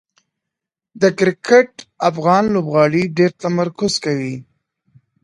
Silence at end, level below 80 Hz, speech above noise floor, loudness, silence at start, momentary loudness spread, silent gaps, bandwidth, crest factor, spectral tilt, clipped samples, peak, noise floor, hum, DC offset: 0.8 s; -58 dBFS; 68 dB; -16 LUFS; 0.95 s; 9 LU; none; 11.5 kHz; 18 dB; -5.5 dB/octave; under 0.1%; 0 dBFS; -83 dBFS; none; under 0.1%